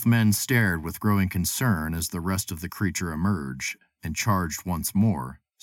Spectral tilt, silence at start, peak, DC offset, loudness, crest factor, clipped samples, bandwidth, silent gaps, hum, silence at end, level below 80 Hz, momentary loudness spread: -5 dB/octave; 0 s; -10 dBFS; under 0.1%; -26 LUFS; 14 dB; under 0.1%; 17.5 kHz; none; none; 0.3 s; -46 dBFS; 10 LU